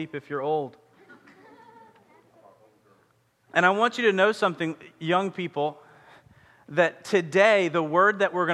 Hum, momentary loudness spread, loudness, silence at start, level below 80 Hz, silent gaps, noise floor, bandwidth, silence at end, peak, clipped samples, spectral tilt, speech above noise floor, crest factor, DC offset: none; 12 LU; -24 LUFS; 0 s; -76 dBFS; none; -65 dBFS; 12 kHz; 0 s; -4 dBFS; under 0.1%; -5 dB/octave; 42 dB; 22 dB; under 0.1%